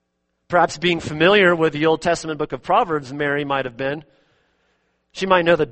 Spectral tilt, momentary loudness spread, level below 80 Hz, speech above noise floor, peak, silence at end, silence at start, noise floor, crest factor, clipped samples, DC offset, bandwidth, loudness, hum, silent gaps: -5 dB/octave; 12 LU; -52 dBFS; 53 dB; 0 dBFS; 0 s; 0.5 s; -72 dBFS; 20 dB; under 0.1%; under 0.1%; 8.8 kHz; -19 LUFS; none; none